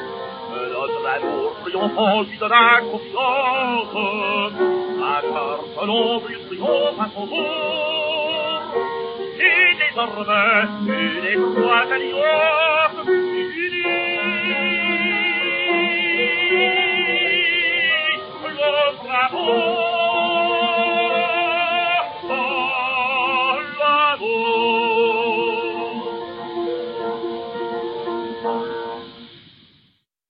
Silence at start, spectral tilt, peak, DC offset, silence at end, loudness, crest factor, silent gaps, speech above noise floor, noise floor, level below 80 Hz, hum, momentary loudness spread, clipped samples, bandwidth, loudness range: 0 s; -0.5 dB/octave; 0 dBFS; under 0.1%; 0.9 s; -19 LUFS; 20 dB; none; 42 dB; -62 dBFS; -64 dBFS; none; 11 LU; under 0.1%; 5.2 kHz; 5 LU